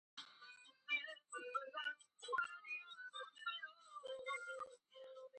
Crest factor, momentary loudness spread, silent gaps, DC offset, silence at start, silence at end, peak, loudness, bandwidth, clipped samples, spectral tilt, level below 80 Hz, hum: 18 dB; 15 LU; none; under 0.1%; 0.15 s; 0 s; -30 dBFS; -47 LUFS; 9.4 kHz; under 0.1%; 0.5 dB/octave; under -90 dBFS; none